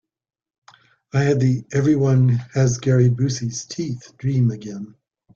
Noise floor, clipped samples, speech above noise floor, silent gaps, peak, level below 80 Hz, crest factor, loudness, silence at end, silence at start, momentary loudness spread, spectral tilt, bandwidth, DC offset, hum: -87 dBFS; under 0.1%; 69 dB; none; -6 dBFS; -54 dBFS; 16 dB; -20 LUFS; 0.45 s; 1.15 s; 12 LU; -7 dB/octave; 7.4 kHz; under 0.1%; none